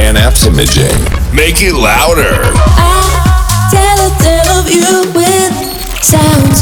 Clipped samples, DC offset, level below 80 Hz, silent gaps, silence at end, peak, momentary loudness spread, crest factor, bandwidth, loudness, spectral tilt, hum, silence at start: under 0.1%; under 0.1%; -12 dBFS; none; 0 s; 0 dBFS; 3 LU; 8 dB; over 20 kHz; -8 LUFS; -4 dB/octave; none; 0 s